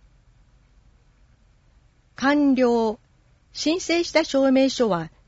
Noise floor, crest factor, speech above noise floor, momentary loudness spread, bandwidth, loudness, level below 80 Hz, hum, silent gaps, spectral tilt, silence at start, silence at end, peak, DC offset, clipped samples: -58 dBFS; 18 dB; 38 dB; 9 LU; 8 kHz; -21 LUFS; -56 dBFS; none; none; -4 dB/octave; 2.2 s; 0.2 s; -6 dBFS; under 0.1%; under 0.1%